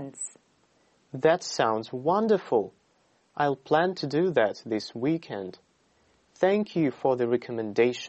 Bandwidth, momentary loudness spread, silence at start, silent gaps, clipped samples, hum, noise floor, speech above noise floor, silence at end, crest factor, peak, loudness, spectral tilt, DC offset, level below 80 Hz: 8.4 kHz; 13 LU; 0 s; none; under 0.1%; none; -67 dBFS; 41 dB; 0 s; 18 dB; -8 dBFS; -27 LUFS; -5.5 dB/octave; under 0.1%; -72 dBFS